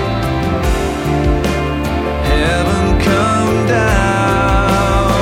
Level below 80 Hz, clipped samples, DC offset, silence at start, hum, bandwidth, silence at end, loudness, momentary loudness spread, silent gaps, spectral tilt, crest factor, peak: -20 dBFS; under 0.1%; under 0.1%; 0 s; none; 16.5 kHz; 0 s; -14 LUFS; 4 LU; none; -6 dB/octave; 12 dB; 0 dBFS